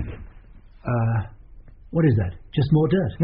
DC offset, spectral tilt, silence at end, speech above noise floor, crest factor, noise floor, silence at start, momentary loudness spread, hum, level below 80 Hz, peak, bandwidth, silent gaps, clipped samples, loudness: under 0.1%; -8 dB/octave; 0 s; 25 dB; 14 dB; -46 dBFS; 0 s; 16 LU; none; -42 dBFS; -8 dBFS; 5.2 kHz; none; under 0.1%; -22 LUFS